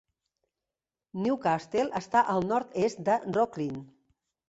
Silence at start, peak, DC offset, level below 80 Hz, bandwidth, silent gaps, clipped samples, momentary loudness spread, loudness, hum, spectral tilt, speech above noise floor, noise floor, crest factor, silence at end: 1.15 s; -10 dBFS; under 0.1%; -68 dBFS; 8.2 kHz; none; under 0.1%; 10 LU; -29 LUFS; none; -6 dB/octave; over 62 dB; under -90 dBFS; 20 dB; 0.65 s